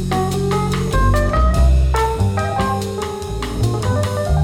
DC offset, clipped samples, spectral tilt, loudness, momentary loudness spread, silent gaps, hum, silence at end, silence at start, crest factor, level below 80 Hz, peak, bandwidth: under 0.1%; under 0.1%; -6 dB/octave; -18 LUFS; 9 LU; none; none; 0 s; 0 s; 12 dB; -20 dBFS; -4 dBFS; 15.5 kHz